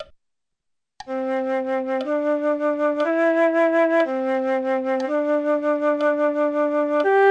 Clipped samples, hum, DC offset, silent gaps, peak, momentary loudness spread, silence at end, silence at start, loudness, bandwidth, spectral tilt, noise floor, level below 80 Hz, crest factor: under 0.1%; none; under 0.1%; none; -8 dBFS; 6 LU; 0 s; 0 s; -21 LUFS; 8.4 kHz; -4.5 dB/octave; -77 dBFS; -68 dBFS; 12 dB